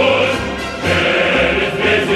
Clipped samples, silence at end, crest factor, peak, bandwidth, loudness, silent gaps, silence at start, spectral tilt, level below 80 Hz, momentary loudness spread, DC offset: under 0.1%; 0 s; 12 dB; -2 dBFS; 13 kHz; -15 LUFS; none; 0 s; -4.5 dB/octave; -36 dBFS; 7 LU; under 0.1%